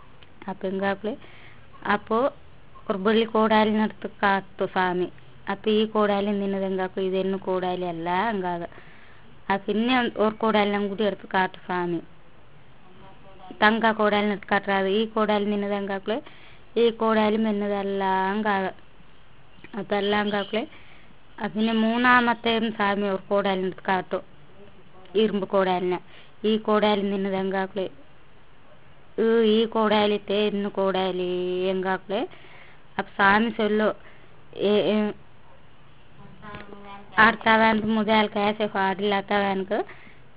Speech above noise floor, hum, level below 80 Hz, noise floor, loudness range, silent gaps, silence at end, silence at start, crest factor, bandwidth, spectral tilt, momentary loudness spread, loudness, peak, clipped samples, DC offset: 31 dB; none; -56 dBFS; -54 dBFS; 4 LU; none; 0.45 s; 0.4 s; 22 dB; 4 kHz; -9.5 dB/octave; 13 LU; -24 LUFS; -2 dBFS; under 0.1%; 0.5%